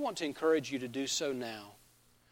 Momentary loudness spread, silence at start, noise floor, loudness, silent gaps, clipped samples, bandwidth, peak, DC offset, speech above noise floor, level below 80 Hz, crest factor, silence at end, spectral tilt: 14 LU; 0 s; -66 dBFS; -34 LUFS; none; under 0.1%; 16.5 kHz; -18 dBFS; under 0.1%; 31 dB; -74 dBFS; 18 dB; 0.55 s; -3 dB/octave